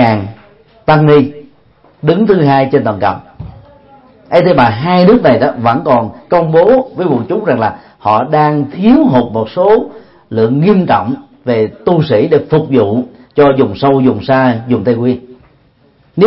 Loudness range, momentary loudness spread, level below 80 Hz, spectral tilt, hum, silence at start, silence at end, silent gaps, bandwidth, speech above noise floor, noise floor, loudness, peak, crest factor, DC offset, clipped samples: 2 LU; 10 LU; -44 dBFS; -10 dB/octave; none; 0 s; 0 s; none; 5.8 kHz; 39 dB; -49 dBFS; -11 LUFS; 0 dBFS; 10 dB; under 0.1%; 0.1%